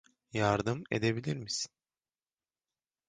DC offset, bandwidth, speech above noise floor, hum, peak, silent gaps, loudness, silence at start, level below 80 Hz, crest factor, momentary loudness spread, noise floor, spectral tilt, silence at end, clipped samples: under 0.1%; 10 kHz; over 58 dB; none; -14 dBFS; none; -33 LUFS; 0.35 s; -62 dBFS; 22 dB; 8 LU; under -90 dBFS; -5 dB/octave; 1.4 s; under 0.1%